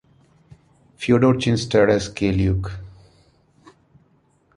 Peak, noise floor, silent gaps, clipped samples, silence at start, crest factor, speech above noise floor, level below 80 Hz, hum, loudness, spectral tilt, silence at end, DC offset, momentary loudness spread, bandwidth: -4 dBFS; -60 dBFS; none; under 0.1%; 1 s; 18 dB; 42 dB; -40 dBFS; none; -19 LUFS; -6.5 dB/octave; 1.7 s; under 0.1%; 13 LU; 11 kHz